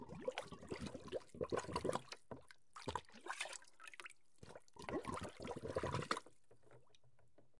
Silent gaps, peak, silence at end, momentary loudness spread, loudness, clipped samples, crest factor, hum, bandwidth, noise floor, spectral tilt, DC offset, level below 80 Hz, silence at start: none; -22 dBFS; 0.2 s; 15 LU; -47 LUFS; under 0.1%; 26 dB; none; 11.5 kHz; -74 dBFS; -4.5 dB/octave; under 0.1%; -70 dBFS; 0 s